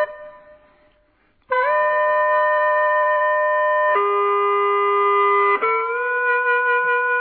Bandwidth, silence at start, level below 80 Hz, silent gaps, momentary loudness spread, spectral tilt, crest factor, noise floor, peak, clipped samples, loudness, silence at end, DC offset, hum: 4.5 kHz; 0 s; -64 dBFS; none; 4 LU; -5.5 dB/octave; 10 dB; -60 dBFS; -8 dBFS; under 0.1%; -18 LUFS; 0 s; under 0.1%; none